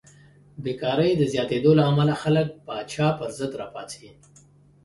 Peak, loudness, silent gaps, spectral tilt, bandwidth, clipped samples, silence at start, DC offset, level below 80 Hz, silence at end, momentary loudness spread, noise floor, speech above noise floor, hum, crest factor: -6 dBFS; -23 LUFS; none; -7 dB/octave; 11.5 kHz; under 0.1%; 0.6 s; under 0.1%; -58 dBFS; 0.75 s; 17 LU; -54 dBFS; 31 dB; none; 18 dB